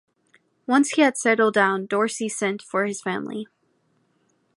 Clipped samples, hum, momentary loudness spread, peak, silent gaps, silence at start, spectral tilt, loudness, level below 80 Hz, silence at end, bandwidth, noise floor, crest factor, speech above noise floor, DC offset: under 0.1%; none; 14 LU; -4 dBFS; none; 0.7 s; -4 dB/octave; -22 LUFS; -76 dBFS; 1.1 s; 11.5 kHz; -67 dBFS; 20 dB; 45 dB; under 0.1%